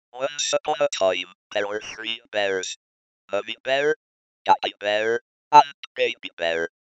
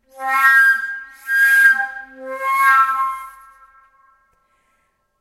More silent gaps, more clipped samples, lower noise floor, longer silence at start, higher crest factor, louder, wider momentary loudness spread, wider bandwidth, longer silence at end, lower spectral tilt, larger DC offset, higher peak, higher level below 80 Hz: first, 1.35-1.50 s, 2.76-3.28 s, 3.60-3.64 s, 3.96-4.45 s, 5.21-5.51 s, 5.74-5.95 s, 6.33-6.37 s vs none; neither; first, under -90 dBFS vs -65 dBFS; about the same, 0.15 s vs 0.2 s; first, 24 dB vs 16 dB; second, -24 LUFS vs -14 LUFS; second, 13 LU vs 19 LU; second, 8.6 kHz vs 16 kHz; second, 0.25 s vs 1.9 s; first, -1.5 dB/octave vs 1.5 dB/octave; neither; about the same, 0 dBFS vs -2 dBFS; about the same, -70 dBFS vs -66 dBFS